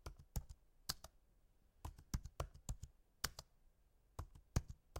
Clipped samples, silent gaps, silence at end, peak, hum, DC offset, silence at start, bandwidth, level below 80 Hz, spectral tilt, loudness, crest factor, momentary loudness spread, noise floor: under 0.1%; none; 0 s; -22 dBFS; none; under 0.1%; 0.05 s; 16.5 kHz; -54 dBFS; -3.5 dB/octave; -50 LUFS; 28 dB; 13 LU; -74 dBFS